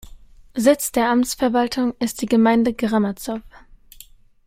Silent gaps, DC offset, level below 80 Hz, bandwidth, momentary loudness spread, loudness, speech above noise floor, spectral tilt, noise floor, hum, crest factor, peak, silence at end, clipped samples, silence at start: none; under 0.1%; -48 dBFS; 16 kHz; 12 LU; -19 LUFS; 28 dB; -4.5 dB/octave; -47 dBFS; none; 18 dB; -2 dBFS; 1 s; under 0.1%; 0.05 s